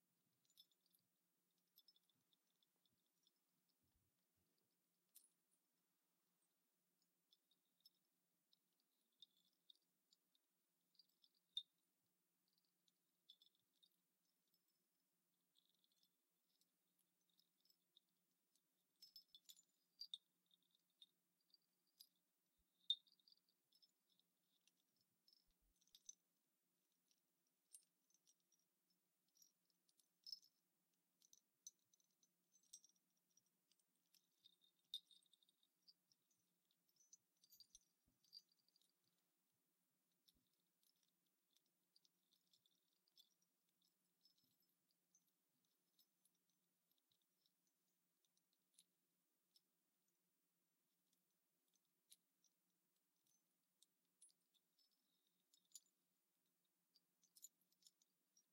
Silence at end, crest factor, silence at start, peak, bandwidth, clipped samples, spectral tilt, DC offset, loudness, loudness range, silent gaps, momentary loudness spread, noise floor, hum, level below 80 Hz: 0.1 s; 38 dB; 0.55 s; -32 dBFS; 16 kHz; under 0.1%; 1.5 dB/octave; under 0.1%; -57 LUFS; 10 LU; none; 21 LU; under -90 dBFS; none; under -90 dBFS